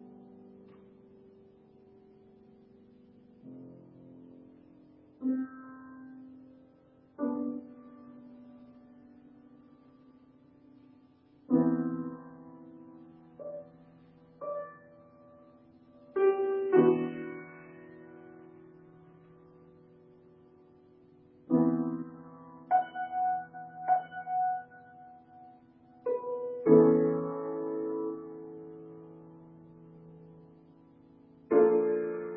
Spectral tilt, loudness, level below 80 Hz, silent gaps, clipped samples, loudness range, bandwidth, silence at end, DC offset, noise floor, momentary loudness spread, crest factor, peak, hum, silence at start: -8.5 dB/octave; -30 LUFS; -76 dBFS; none; under 0.1%; 17 LU; 3.2 kHz; 0 s; under 0.1%; -61 dBFS; 28 LU; 24 dB; -10 dBFS; none; 0.05 s